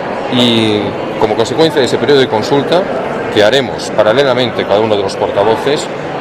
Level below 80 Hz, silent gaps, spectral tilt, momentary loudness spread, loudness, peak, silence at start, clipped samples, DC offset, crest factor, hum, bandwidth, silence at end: -46 dBFS; none; -5 dB/octave; 6 LU; -12 LUFS; 0 dBFS; 0 s; 0.1%; under 0.1%; 12 dB; none; 14 kHz; 0 s